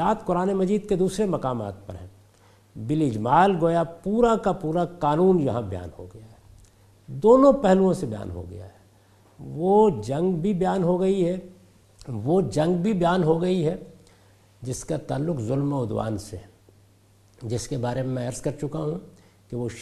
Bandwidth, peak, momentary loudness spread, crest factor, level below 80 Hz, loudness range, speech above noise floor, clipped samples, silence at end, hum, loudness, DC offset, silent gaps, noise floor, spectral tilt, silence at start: 12.5 kHz; -4 dBFS; 18 LU; 20 dB; -50 dBFS; 8 LU; 34 dB; under 0.1%; 0 s; none; -23 LUFS; under 0.1%; none; -57 dBFS; -7.5 dB/octave; 0 s